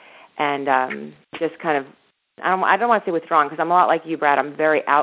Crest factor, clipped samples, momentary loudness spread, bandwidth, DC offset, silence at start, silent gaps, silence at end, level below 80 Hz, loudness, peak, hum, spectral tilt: 18 dB; under 0.1%; 10 LU; 4 kHz; under 0.1%; 0.35 s; none; 0 s; -72 dBFS; -20 LUFS; -2 dBFS; none; -8.5 dB/octave